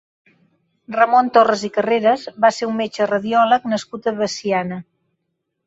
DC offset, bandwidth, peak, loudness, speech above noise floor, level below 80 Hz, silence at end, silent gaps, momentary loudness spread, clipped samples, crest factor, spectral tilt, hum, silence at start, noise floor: under 0.1%; 8 kHz; -2 dBFS; -18 LUFS; 57 dB; -64 dBFS; 0.85 s; none; 9 LU; under 0.1%; 18 dB; -4.5 dB/octave; none; 0.9 s; -75 dBFS